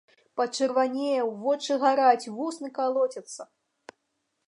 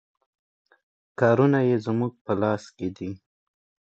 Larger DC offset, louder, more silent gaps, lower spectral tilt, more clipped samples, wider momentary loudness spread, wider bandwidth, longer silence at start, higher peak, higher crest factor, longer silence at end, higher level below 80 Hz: neither; about the same, -26 LUFS vs -24 LUFS; second, none vs 2.21-2.25 s; second, -3 dB/octave vs -8.5 dB/octave; neither; about the same, 15 LU vs 17 LU; first, 11 kHz vs 8 kHz; second, 0.35 s vs 1.2 s; about the same, -8 dBFS vs -6 dBFS; about the same, 20 dB vs 20 dB; first, 1.05 s vs 0.75 s; second, -86 dBFS vs -58 dBFS